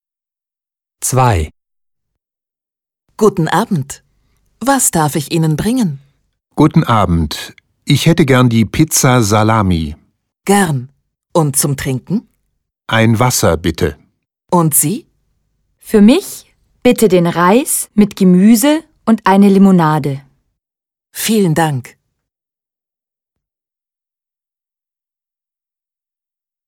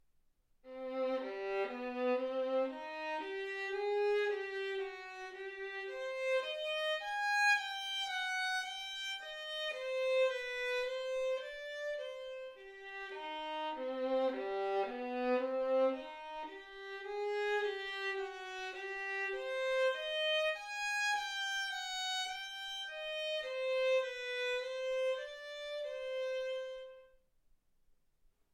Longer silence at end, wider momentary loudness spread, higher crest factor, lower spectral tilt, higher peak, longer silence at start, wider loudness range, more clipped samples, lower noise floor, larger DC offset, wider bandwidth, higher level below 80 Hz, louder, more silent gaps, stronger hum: first, 4.85 s vs 1.45 s; about the same, 13 LU vs 12 LU; about the same, 14 dB vs 18 dB; first, -5 dB/octave vs -0.5 dB/octave; first, 0 dBFS vs -20 dBFS; first, 1 s vs 0.65 s; first, 9 LU vs 5 LU; neither; first, -89 dBFS vs -72 dBFS; neither; first, 19 kHz vs 15 kHz; first, -38 dBFS vs -74 dBFS; first, -12 LUFS vs -37 LUFS; neither; neither